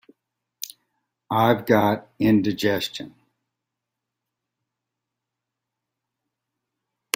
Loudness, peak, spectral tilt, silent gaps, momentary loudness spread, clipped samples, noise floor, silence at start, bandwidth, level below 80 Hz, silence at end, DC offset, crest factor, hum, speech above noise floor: -21 LUFS; -2 dBFS; -5.5 dB/octave; none; 17 LU; under 0.1%; -84 dBFS; 1.3 s; 16.5 kHz; -60 dBFS; 4.05 s; under 0.1%; 26 dB; none; 63 dB